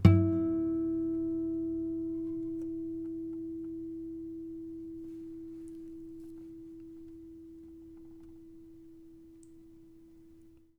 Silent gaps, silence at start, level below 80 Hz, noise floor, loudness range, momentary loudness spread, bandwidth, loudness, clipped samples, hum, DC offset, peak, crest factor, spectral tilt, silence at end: none; 0 s; -56 dBFS; -58 dBFS; 18 LU; 23 LU; 5.6 kHz; -35 LUFS; under 0.1%; none; under 0.1%; -8 dBFS; 28 dB; -10 dB/octave; 0.2 s